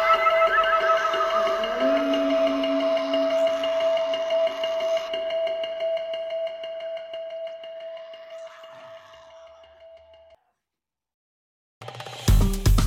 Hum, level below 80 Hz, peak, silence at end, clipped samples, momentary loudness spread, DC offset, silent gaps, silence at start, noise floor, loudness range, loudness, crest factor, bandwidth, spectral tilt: none; -34 dBFS; -8 dBFS; 0 s; under 0.1%; 20 LU; under 0.1%; 11.14-11.81 s; 0 s; -89 dBFS; 20 LU; -24 LUFS; 16 dB; 16 kHz; -5 dB/octave